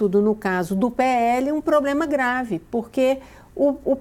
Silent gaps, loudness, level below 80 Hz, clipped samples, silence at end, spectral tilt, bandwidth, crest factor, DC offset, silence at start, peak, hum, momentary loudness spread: none; -21 LUFS; -50 dBFS; under 0.1%; 0 s; -6.5 dB/octave; 17 kHz; 14 dB; under 0.1%; 0 s; -8 dBFS; none; 7 LU